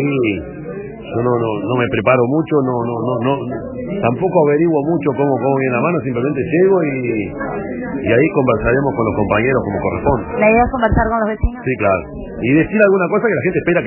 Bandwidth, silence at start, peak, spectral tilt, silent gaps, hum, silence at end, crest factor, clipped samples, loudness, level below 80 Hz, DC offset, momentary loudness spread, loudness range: 3.1 kHz; 0 s; 0 dBFS; -12 dB/octave; none; none; 0 s; 16 dB; under 0.1%; -16 LUFS; -34 dBFS; under 0.1%; 10 LU; 2 LU